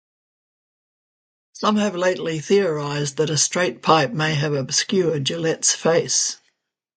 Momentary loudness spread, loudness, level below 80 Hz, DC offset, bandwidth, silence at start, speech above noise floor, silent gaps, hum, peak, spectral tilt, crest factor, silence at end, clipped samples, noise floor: 6 LU; -20 LUFS; -64 dBFS; under 0.1%; 9.6 kHz; 1.55 s; 50 dB; none; none; 0 dBFS; -3.5 dB/octave; 20 dB; 0.6 s; under 0.1%; -71 dBFS